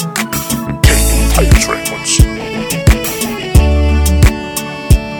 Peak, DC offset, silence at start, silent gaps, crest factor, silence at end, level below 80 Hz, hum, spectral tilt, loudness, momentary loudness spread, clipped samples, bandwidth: 0 dBFS; under 0.1%; 0 s; none; 12 dB; 0 s; -14 dBFS; none; -4.5 dB/octave; -12 LUFS; 8 LU; 0.7%; 19.5 kHz